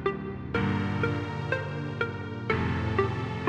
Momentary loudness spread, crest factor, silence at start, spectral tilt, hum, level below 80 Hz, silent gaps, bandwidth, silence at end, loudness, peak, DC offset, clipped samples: 5 LU; 20 dB; 0 s; -7.5 dB/octave; none; -48 dBFS; none; 8.8 kHz; 0 s; -30 LUFS; -10 dBFS; under 0.1%; under 0.1%